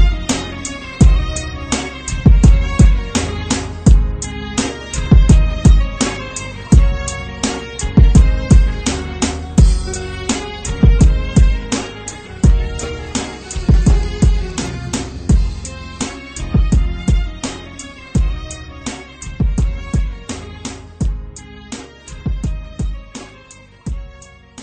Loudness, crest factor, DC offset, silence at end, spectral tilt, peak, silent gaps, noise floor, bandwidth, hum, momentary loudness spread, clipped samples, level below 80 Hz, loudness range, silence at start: -16 LUFS; 14 dB; under 0.1%; 0 s; -5.5 dB/octave; 0 dBFS; none; -41 dBFS; 9.2 kHz; none; 17 LU; under 0.1%; -16 dBFS; 9 LU; 0 s